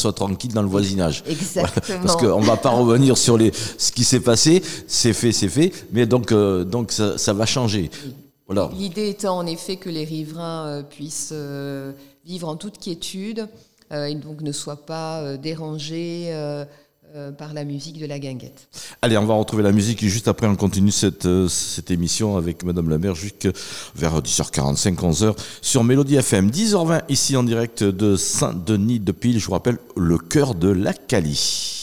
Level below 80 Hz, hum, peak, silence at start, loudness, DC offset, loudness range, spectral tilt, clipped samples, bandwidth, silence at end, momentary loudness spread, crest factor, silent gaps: -46 dBFS; none; -6 dBFS; 0 s; -20 LUFS; 0.5%; 13 LU; -4.5 dB/octave; under 0.1%; over 20 kHz; 0 s; 14 LU; 16 dB; none